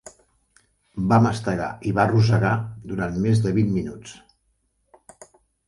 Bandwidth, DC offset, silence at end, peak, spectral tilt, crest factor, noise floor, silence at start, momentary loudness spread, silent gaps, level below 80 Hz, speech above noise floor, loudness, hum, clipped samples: 11.5 kHz; under 0.1%; 1.55 s; -4 dBFS; -7.5 dB/octave; 20 dB; -69 dBFS; 0.05 s; 15 LU; none; -48 dBFS; 49 dB; -22 LUFS; none; under 0.1%